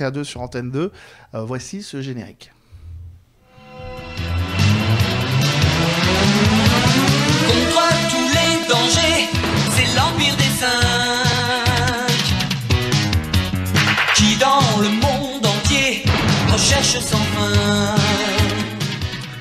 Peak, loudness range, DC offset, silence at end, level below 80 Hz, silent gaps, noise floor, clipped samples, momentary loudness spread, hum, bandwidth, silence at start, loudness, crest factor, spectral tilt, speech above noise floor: -2 dBFS; 12 LU; under 0.1%; 0 s; -34 dBFS; none; -48 dBFS; under 0.1%; 13 LU; none; 15.5 kHz; 0 s; -16 LUFS; 16 dB; -4 dB/octave; 28 dB